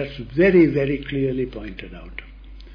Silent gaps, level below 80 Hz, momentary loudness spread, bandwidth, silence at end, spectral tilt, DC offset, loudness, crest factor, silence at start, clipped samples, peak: none; -40 dBFS; 22 LU; 5.2 kHz; 0 s; -9.5 dB/octave; under 0.1%; -19 LUFS; 16 dB; 0 s; under 0.1%; -4 dBFS